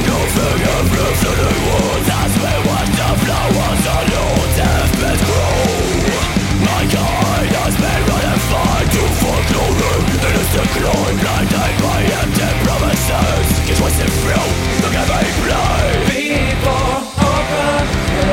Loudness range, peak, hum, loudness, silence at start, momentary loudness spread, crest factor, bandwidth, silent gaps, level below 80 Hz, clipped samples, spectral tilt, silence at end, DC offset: 0 LU; -2 dBFS; none; -15 LUFS; 0 s; 1 LU; 12 dB; 17 kHz; none; -22 dBFS; under 0.1%; -4.5 dB/octave; 0 s; under 0.1%